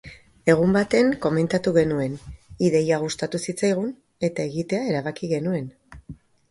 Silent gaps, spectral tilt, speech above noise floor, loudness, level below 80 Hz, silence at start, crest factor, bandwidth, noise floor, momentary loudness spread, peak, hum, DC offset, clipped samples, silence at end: none; -6 dB/octave; 22 dB; -23 LUFS; -52 dBFS; 0.05 s; 20 dB; 11.5 kHz; -44 dBFS; 11 LU; -2 dBFS; none; under 0.1%; under 0.1%; 0.35 s